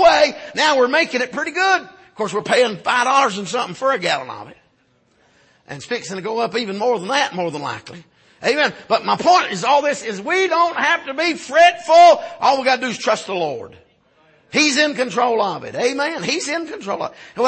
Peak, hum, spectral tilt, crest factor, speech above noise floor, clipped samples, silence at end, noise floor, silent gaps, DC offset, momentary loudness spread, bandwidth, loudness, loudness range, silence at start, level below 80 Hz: -2 dBFS; none; -3 dB/octave; 16 dB; 42 dB; under 0.1%; 0 s; -60 dBFS; none; under 0.1%; 12 LU; 8.8 kHz; -17 LUFS; 8 LU; 0 s; -62 dBFS